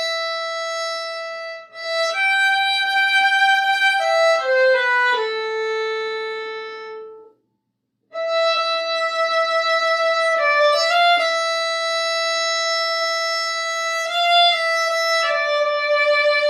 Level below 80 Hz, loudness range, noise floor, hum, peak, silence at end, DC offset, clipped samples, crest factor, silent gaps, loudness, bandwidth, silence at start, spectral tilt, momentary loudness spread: -86 dBFS; 7 LU; -74 dBFS; none; -4 dBFS; 0 s; under 0.1%; under 0.1%; 14 dB; none; -18 LUFS; 14 kHz; 0 s; 2.5 dB/octave; 12 LU